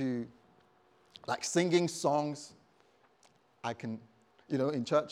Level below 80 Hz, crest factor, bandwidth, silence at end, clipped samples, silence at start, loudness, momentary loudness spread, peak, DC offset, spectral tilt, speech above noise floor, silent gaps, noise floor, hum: -82 dBFS; 20 dB; 14 kHz; 0 s; under 0.1%; 0 s; -33 LUFS; 17 LU; -14 dBFS; under 0.1%; -5 dB/octave; 35 dB; none; -67 dBFS; none